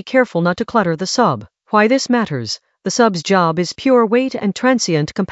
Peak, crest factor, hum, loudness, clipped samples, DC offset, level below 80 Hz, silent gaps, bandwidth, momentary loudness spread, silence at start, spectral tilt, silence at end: 0 dBFS; 16 dB; none; -16 LUFS; under 0.1%; under 0.1%; -56 dBFS; none; 8.2 kHz; 7 LU; 0.05 s; -5 dB/octave; 0 s